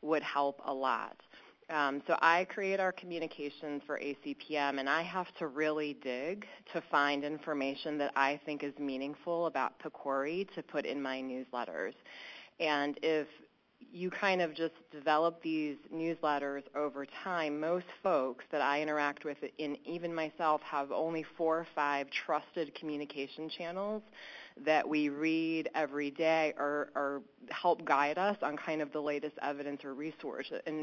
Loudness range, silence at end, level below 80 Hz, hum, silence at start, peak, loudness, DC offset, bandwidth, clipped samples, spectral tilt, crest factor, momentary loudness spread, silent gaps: 4 LU; 0 s; -84 dBFS; none; 0 s; -12 dBFS; -35 LUFS; under 0.1%; 7.2 kHz; under 0.1%; -5 dB/octave; 24 dB; 10 LU; none